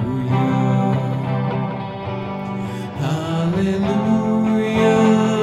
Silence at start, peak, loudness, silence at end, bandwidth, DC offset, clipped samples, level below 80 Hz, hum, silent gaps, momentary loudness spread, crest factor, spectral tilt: 0 s; -4 dBFS; -19 LUFS; 0 s; 12 kHz; under 0.1%; under 0.1%; -48 dBFS; none; none; 11 LU; 14 dB; -7.5 dB/octave